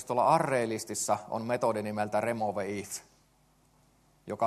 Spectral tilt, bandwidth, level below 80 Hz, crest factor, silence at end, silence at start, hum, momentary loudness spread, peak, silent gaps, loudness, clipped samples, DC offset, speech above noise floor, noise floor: -4.5 dB/octave; 13 kHz; -72 dBFS; 20 dB; 0 s; 0 s; none; 12 LU; -10 dBFS; none; -30 LUFS; under 0.1%; under 0.1%; 36 dB; -66 dBFS